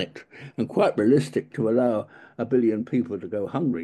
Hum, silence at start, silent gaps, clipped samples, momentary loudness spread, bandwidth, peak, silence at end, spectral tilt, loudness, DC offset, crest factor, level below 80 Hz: none; 0 s; none; under 0.1%; 13 LU; 12 kHz; -8 dBFS; 0 s; -7.5 dB/octave; -24 LUFS; under 0.1%; 16 dB; -68 dBFS